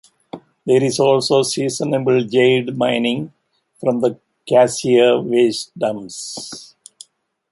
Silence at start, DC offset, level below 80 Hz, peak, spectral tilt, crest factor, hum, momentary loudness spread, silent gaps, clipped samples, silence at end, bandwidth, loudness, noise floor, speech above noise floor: 0.35 s; under 0.1%; -62 dBFS; -2 dBFS; -4.5 dB/octave; 16 dB; none; 17 LU; none; under 0.1%; 0.85 s; 11.5 kHz; -17 LUFS; -51 dBFS; 35 dB